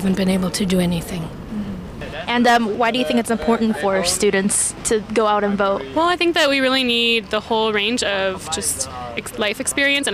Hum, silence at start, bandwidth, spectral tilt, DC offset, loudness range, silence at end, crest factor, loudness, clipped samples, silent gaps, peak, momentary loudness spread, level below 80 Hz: none; 0 s; 16 kHz; -3.5 dB/octave; under 0.1%; 2 LU; 0 s; 14 dB; -18 LUFS; under 0.1%; none; -6 dBFS; 12 LU; -44 dBFS